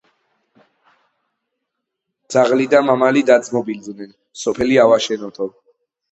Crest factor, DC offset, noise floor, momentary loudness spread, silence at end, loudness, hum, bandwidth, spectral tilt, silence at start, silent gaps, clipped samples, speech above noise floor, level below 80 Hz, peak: 18 dB; under 0.1%; -78 dBFS; 16 LU; 0.65 s; -16 LUFS; none; 8.2 kHz; -4.5 dB/octave; 2.3 s; none; under 0.1%; 62 dB; -54 dBFS; 0 dBFS